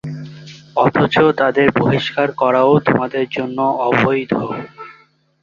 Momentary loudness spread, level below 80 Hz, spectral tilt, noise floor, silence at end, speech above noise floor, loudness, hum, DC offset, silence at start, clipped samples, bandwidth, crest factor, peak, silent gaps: 14 LU; -52 dBFS; -7.5 dB/octave; -51 dBFS; 0.5 s; 36 dB; -15 LUFS; none; under 0.1%; 0.05 s; under 0.1%; 7.4 kHz; 16 dB; -2 dBFS; none